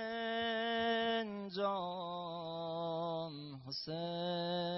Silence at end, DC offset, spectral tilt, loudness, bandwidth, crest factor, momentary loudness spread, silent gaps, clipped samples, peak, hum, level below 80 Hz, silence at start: 0 s; under 0.1%; -3 dB/octave; -39 LUFS; 5.8 kHz; 14 dB; 8 LU; none; under 0.1%; -24 dBFS; none; -76 dBFS; 0 s